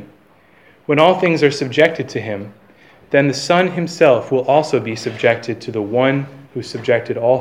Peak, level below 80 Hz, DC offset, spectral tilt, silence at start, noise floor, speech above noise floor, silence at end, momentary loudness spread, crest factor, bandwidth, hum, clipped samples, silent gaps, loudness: 0 dBFS; -64 dBFS; 0.1%; -5.5 dB/octave; 0 s; -50 dBFS; 35 dB; 0 s; 13 LU; 16 dB; 12 kHz; none; under 0.1%; none; -16 LUFS